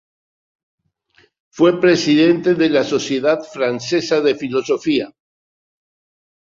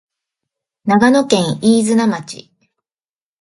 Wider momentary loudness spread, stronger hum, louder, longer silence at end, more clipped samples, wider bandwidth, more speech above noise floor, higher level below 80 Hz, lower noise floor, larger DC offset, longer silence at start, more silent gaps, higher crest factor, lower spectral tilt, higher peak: second, 8 LU vs 15 LU; neither; second, -16 LUFS vs -13 LUFS; first, 1.5 s vs 1 s; neither; second, 7.6 kHz vs 11.5 kHz; second, 41 dB vs over 77 dB; second, -62 dBFS vs -56 dBFS; second, -57 dBFS vs under -90 dBFS; neither; first, 1.55 s vs 0.85 s; neither; about the same, 16 dB vs 16 dB; about the same, -5 dB/octave vs -5 dB/octave; about the same, -2 dBFS vs 0 dBFS